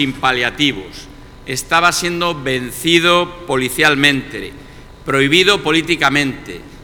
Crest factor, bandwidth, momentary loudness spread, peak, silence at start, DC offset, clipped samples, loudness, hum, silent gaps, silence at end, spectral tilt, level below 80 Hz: 16 dB; 19 kHz; 18 LU; 0 dBFS; 0 s; under 0.1%; under 0.1%; -14 LUFS; none; none; 0 s; -3.5 dB/octave; -40 dBFS